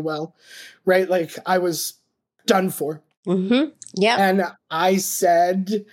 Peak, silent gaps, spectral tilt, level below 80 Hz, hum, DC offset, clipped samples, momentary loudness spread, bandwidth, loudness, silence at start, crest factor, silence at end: -2 dBFS; 3.17-3.23 s; -4.5 dB/octave; -72 dBFS; none; under 0.1%; under 0.1%; 12 LU; 17 kHz; -21 LUFS; 0 s; 18 dB; 0.1 s